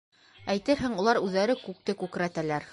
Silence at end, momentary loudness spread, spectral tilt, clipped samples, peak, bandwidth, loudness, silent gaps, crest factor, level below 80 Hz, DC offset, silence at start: 0 s; 8 LU; -5.5 dB/octave; under 0.1%; -10 dBFS; 11.5 kHz; -28 LUFS; none; 18 dB; -58 dBFS; under 0.1%; 0.4 s